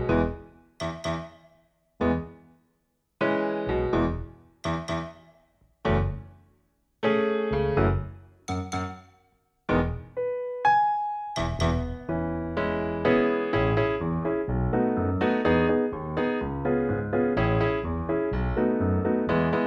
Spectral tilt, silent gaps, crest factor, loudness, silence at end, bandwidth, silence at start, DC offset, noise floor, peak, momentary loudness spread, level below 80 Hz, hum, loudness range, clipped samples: -7.5 dB/octave; none; 18 dB; -27 LUFS; 0 s; 10.5 kHz; 0 s; under 0.1%; -73 dBFS; -10 dBFS; 11 LU; -40 dBFS; none; 5 LU; under 0.1%